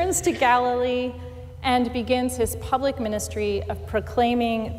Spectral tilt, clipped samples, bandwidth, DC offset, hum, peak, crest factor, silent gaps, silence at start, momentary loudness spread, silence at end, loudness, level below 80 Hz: -4.5 dB/octave; under 0.1%; 16 kHz; under 0.1%; none; -10 dBFS; 14 dB; none; 0 s; 9 LU; 0 s; -24 LUFS; -42 dBFS